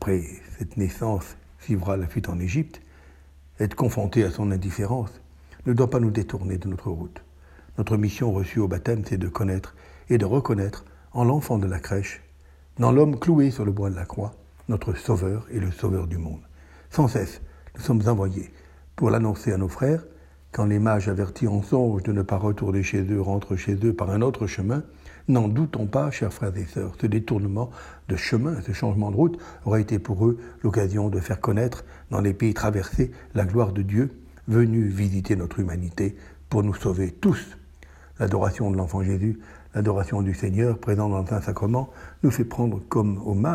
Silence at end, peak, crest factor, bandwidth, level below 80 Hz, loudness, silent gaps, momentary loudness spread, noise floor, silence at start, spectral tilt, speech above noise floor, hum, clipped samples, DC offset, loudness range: 0 s; -4 dBFS; 20 dB; 14.5 kHz; -44 dBFS; -25 LUFS; none; 11 LU; -50 dBFS; 0 s; -8 dB/octave; 27 dB; none; under 0.1%; under 0.1%; 3 LU